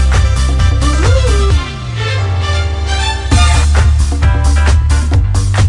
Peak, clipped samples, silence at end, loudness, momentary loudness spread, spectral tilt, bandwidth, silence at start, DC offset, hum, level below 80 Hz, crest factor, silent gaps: 0 dBFS; under 0.1%; 0 s; -12 LUFS; 5 LU; -5 dB/octave; 11.5 kHz; 0 s; under 0.1%; none; -12 dBFS; 10 dB; none